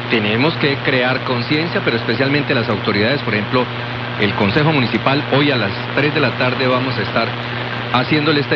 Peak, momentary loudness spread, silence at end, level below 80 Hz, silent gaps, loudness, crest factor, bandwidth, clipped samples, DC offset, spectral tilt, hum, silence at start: 0 dBFS; 4 LU; 0 s; -48 dBFS; none; -16 LUFS; 16 dB; 6.4 kHz; under 0.1%; under 0.1%; -3.5 dB/octave; none; 0 s